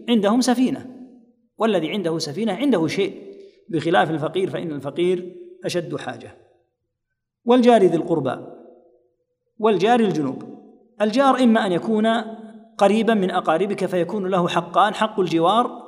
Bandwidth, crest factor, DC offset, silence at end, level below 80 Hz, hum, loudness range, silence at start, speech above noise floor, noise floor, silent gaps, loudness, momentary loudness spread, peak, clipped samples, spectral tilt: 14 kHz; 20 dB; under 0.1%; 0 s; -72 dBFS; none; 5 LU; 0 s; 60 dB; -79 dBFS; none; -20 LUFS; 14 LU; -2 dBFS; under 0.1%; -5.5 dB/octave